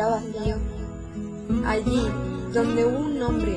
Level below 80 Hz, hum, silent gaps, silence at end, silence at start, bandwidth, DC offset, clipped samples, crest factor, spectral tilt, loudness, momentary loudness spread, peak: -34 dBFS; none; none; 0 s; 0 s; 10.5 kHz; under 0.1%; under 0.1%; 14 dB; -7 dB/octave; -26 LUFS; 12 LU; -10 dBFS